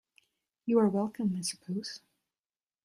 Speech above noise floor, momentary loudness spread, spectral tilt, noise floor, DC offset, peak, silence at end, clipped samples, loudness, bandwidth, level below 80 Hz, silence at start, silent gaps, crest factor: over 60 dB; 15 LU; -5.5 dB/octave; under -90 dBFS; under 0.1%; -14 dBFS; 0.9 s; under 0.1%; -31 LUFS; 14 kHz; -76 dBFS; 0.65 s; none; 20 dB